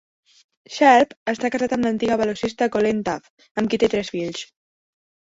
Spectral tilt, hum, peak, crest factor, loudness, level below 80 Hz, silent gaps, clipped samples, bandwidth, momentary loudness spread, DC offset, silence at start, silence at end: -5 dB/octave; none; -2 dBFS; 20 dB; -21 LUFS; -56 dBFS; 1.17-1.26 s, 3.30-3.37 s, 3.51-3.55 s; under 0.1%; 8 kHz; 17 LU; under 0.1%; 0.7 s; 0.75 s